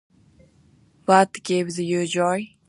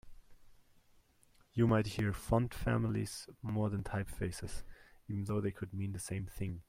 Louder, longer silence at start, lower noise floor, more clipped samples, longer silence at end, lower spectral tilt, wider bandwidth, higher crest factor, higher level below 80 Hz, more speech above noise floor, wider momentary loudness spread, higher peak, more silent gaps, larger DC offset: first, -21 LUFS vs -37 LUFS; first, 1.1 s vs 0.05 s; second, -57 dBFS vs -68 dBFS; neither; first, 0.25 s vs 0.05 s; second, -5 dB/octave vs -6.5 dB/octave; second, 11.5 kHz vs 16 kHz; about the same, 22 dB vs 20 dB; second, -66 dBFS vs -52 dBFS; first, 36 dB vs 32 dB; second, 7 LU vs 12 LU; first, -2 dBFS vs -18 dBFS; neither; neither